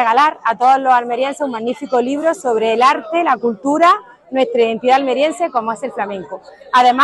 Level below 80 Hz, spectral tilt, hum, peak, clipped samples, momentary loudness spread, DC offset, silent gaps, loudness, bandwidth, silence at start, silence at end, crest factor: -64 dBFS; -3.5 dB/octave; none; -2 dBFS; under 0.1%; 10 LU; under 0.1%; none; -15 LUFS; 12 kHz; 0 s; 0 s; 14 dB